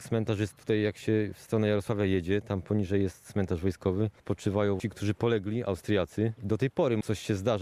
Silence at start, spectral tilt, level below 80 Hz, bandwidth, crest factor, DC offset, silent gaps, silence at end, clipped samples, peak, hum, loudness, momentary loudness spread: 0 s; -7 dB/octave; -56 dBFS; 14 kHz; 16 dB; under 0.1%; none; 0 s; under 0.1%; -14 dBFS; none; -30 LUFS; 4 LU